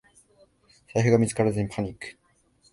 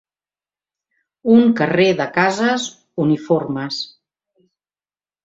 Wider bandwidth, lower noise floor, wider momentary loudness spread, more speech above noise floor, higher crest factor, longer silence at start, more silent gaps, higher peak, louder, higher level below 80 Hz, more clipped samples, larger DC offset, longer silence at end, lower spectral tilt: first, 11.5 kHz vs 7.8 kHz; second, -63 dBFS vs under -90 dBFS; first, 17 LU vs 13 LU; second, 39 dB vs over 74 dB; about the same, 22 dB vs 18 dB; second, 0.95 s vs 1.25 s; neither; second, -6 dBFS vs -2 dBFS; second, -25 LUFS vs -17 LUFS; first, -54 dBFS vs -62 dBFS; neither; neither; second, 0.6 s vs 1.4 s; about the same, -6.5 dB/octave vs -5.5 dB/octave